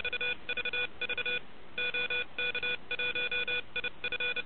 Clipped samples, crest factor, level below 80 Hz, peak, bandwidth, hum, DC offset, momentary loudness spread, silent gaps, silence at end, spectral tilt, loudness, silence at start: under 0.1%; 12 dB; -62 dBFS; -22 dBFS; 4.8 kHz; none; 0.9%; 4 LU; none; 0 s; 1.5 dB/octave; -32 LUFS; 0 s